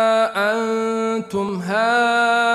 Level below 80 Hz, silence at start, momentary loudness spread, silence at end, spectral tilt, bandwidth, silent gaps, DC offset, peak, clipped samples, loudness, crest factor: -62 dBFS; 0 s; 7 LU; 0 s; -4.5 dB/octave; 13.5 kHz; none; under 0.1%; -6 dBFS; under 0.1%; -19 LUFS; 12 dB